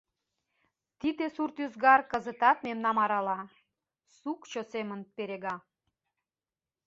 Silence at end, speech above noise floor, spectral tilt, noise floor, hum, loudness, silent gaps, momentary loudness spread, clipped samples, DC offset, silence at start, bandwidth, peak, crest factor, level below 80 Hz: 1.3 s; over 60 dB; -2.5 dB/octave; under -90 dBFS; none; -30 LUFS; none; 16 LU; under 0.1%; under 0.1%; 1.05 s; 7.6 kHz; -10 dBFS; 22 dB; -74 dBFS